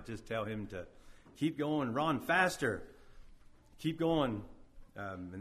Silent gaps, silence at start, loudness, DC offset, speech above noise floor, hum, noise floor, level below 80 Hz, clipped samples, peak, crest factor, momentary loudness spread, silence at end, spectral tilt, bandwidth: none; 0 s; -35 LUFS; under 0.1%; 23 dB; none; -58 dBFS; -58 dBFS; under 0.1%; -14 dBFS; 22 dB; 16 LU; 0 s; -5.5 dB/octave; 15.5 kHz